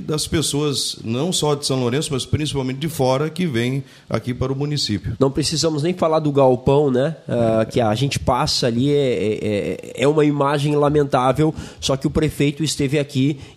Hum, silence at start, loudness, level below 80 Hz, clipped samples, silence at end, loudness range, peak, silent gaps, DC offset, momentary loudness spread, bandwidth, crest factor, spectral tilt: none; 0 s; -19 LUFS; -42 dBFS; under 0.1%; 0.05 s; 3 LU; -2 dBFS; none; under 0.1%; 6 LU; 15.5 kHz; 16 dB; -5.5 dB/octave